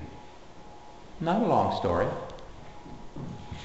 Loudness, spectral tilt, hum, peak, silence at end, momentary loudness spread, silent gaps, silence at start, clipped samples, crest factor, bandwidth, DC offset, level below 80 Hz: -28 LUFS; -7 dB/octave; none; -10 dBFS; 0 s; 24 LU; none; 0 s; under 0.1%; 20 dB; 8.2 kHz; 0.4%; -50 dBFS